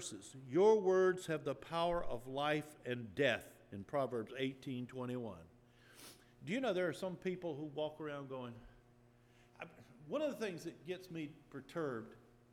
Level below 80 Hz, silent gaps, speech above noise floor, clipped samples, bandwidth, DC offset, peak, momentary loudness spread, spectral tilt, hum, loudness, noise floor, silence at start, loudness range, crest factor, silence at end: -66 dBFS; none; 28 dB; under 0.1%; 15.5 kHz; under 0.1%; -20 dBFS; 21 LU; -5.5 dB/octave; none; -40 LUFS; -67 dBFS; 0 s; 10 LU; 20 dB; 0.35 s